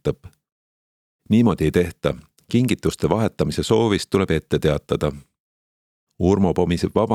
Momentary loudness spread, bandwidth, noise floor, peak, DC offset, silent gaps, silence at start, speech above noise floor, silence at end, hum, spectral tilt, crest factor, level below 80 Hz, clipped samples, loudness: 8 LU; 15 kHz; under -90 dBFS; -2 dBFS; under 0.1%; 0.52-1.19 s, 5.40-6.07 s; 0.05 s; over 71 dB; 0 s; none; -6.5 dB/octave; 20 dB; -42 dBFS; under 0.1%; -21 LUFS